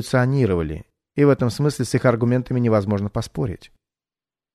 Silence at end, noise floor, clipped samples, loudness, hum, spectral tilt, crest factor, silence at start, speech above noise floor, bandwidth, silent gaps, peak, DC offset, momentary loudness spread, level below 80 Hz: 0.9 s; under -90 dBFS; under 0.1%; -20 LUFS; none; -7 dB/octave; 16 dB; 0 s; over 70 dB; 13.5 kHz; none; -4 dBFS; under 0.1%; 11 LU; -44 dBFS